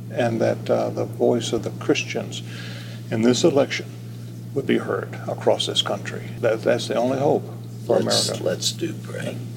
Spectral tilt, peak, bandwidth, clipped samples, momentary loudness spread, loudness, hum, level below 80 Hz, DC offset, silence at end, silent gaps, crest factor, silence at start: -4.5 dB/octave; -4 dBFS; 17 kHz; under 0.1%; 14 LU; -23 LUFS; none; -62 dBFS; under 0.1%; 0 s; none; 18 dB; 0 s